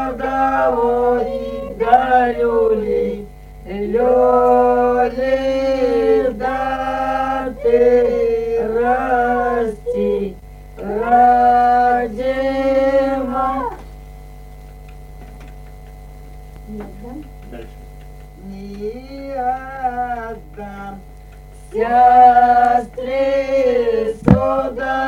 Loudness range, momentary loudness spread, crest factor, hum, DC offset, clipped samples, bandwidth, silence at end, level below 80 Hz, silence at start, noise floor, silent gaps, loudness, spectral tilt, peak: 19 LU; 20 LU; 16 dB; none; under 0.1%; under 0.1%; 15.5 kHz; 0 s; -36 dBFS; 0 s; -37 dBFS; none; -16 LUFS; -7.5 dB/octave; 0 dBFS